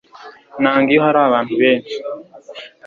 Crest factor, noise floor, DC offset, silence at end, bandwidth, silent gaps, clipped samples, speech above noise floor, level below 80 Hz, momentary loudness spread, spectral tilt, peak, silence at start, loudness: 16 dB; -40 dBFS; under 0.1%; 0.2 s; 7.2 kHz; none; under 0.1%; 26 dB; -60 dBFS; 22 LU; -6.5 dB/octave; -2 dBFS; 0.2 s; -15 LUFS